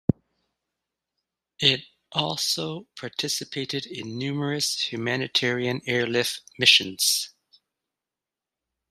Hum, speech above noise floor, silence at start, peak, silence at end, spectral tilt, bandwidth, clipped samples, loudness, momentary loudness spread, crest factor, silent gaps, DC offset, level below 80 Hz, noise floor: none; 63 dB; 0.1 s; -2 dBFS; 1.6 s; -2.5 dB/octave; 15.5 kHz; under 0.1%; -24 LUFS; 13 LU; 26 dB; none; under 0.1%; -62 dBFS; -89 dBFS